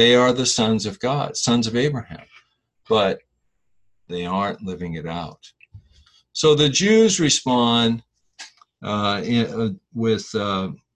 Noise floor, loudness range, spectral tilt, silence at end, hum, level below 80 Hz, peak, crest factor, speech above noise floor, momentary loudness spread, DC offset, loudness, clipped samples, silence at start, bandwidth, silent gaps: -69 dBFS; 8 LU; -4 dB/octave; 0.2 s; none; -52 dBFS; -4 dBFS; 18 dB; 49 dB; 17 LU; under 0.1%; -20 LUFS; under 0.1%; 0 s; 11 kHz; none